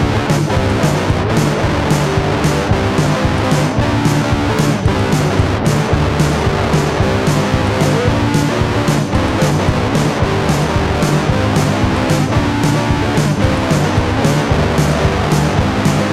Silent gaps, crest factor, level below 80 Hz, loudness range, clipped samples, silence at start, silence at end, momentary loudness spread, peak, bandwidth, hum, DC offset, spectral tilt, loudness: none; 12 dB; -26 dBFS; 0 LU; under 0.1%; 0 s; 0 s; 1 LU; 0 dBFS; 14.5 kHz; none; under 0.1%; -6 dB/octave; -14 LUFS